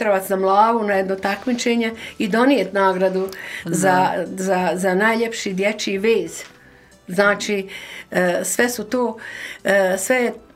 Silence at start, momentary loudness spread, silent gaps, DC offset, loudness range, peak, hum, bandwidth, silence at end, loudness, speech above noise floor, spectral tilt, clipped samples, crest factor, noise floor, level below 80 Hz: 0 s; 10 LU; none; under 0.1%; 3 LU; -2 dBFS; none; 16 kHz; 0.15 s; -19 LUFS; 29 dB; -4 dB/octave; under 0.1%; 18 dB; -48 dBFS; -60 dBFS